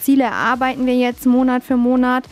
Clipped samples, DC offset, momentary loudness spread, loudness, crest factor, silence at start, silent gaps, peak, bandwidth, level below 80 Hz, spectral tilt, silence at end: under 0.1%; under 0.1%; 2 LU; -16 LUFS; 10 dB; 0 s; none; -6 dBFS; 16 kHz; -48 dBFS; -4.5 dB/octave; 0.1 s